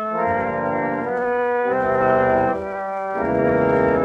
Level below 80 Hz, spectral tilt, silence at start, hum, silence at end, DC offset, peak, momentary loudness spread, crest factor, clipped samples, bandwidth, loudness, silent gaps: -48 dBFS; -8.5 dB/octave; 0 s; none; 0 s; under 0.1%; -6 dBFS; 7 LU; 14 dB; under 0.1%; 6.2 kHz; -20 LUFS; none